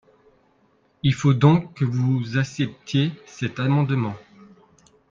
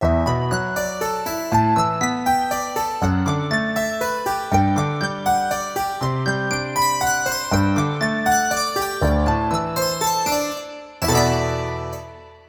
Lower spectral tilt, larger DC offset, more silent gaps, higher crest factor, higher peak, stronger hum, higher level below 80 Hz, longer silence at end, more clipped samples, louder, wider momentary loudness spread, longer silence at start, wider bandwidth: first, -7 dB/octave vs -4.5 dB/octave; neither; neither; about the same, 20 dB vs 16 dB; about the same, -2 dBFS vs -4 dBFS; neither; second, -56 dBFS vs -36 dBFS; first, 0.9 s vs 0.1 s; neither; about the same, -22 LUFS vs -21 LUFS; first, 12 LU vs 6 LU; first, 1.05 s vs 0 s; second, 7.4 kHz vs over 20 kHz